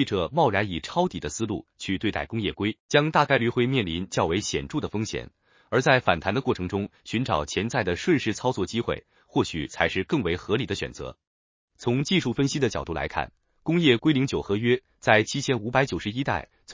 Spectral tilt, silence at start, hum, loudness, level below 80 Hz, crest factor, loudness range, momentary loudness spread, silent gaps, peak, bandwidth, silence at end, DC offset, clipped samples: -5 dB/octave; 0 s; none; -25 LUFS; -48 dBFS; 22 dB; 4 LU; 10 LU; 2.80-2.89 s, 11.27-11.68 s; -2 dBFS; 7.8 kHz; 0 s; under 0.1%; under 0.1%